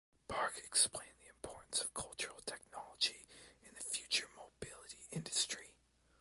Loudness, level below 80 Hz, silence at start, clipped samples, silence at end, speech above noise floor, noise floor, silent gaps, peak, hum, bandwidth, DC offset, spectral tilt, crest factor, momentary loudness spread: -39 LUFS; -70 dBFS; 0.3 s; under 0.1%; 0.5 s; 32 dB; -72 dBFS; none; -18 dBFS; none; 12 kHz; under 0.1%; -0.5 dB/octave; 24 dB; 19 LU